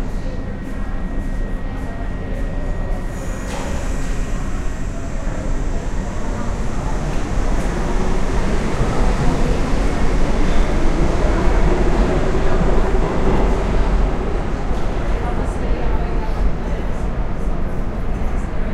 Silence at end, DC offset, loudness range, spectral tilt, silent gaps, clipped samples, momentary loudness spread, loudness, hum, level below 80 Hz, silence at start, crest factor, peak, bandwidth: 0 s; under 0.1%; 7 LU; -6.5 dB/octave; none; under 0.1%; 8 LU; -22 LUFS; none; -18 dBFS; 0 s; 14 dB; -2 dBFS; 10 kHz